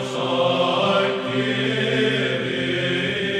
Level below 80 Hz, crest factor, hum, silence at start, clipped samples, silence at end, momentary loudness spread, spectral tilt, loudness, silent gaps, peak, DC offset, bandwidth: -60 dBFS; 14 dB; none; 0 s; under 0.1%; 0 s; 4 LU; -5 dB/octave; -21 LUFS; none; -6 dBFS; under 0.1%; 11.5 kHz